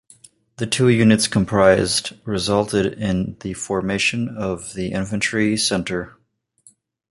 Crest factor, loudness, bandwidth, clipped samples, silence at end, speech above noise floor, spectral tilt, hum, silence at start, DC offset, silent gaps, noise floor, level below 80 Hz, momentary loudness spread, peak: 18 dB; -19 LUFS; 11.5 kHz; under 0.1%; 1 s; 37 dB; -4.5 dB/octave; none; 0.6 s; under 0.1%; none; -56 dBFS; -46 dBFS; 12 LU; -2 dBFS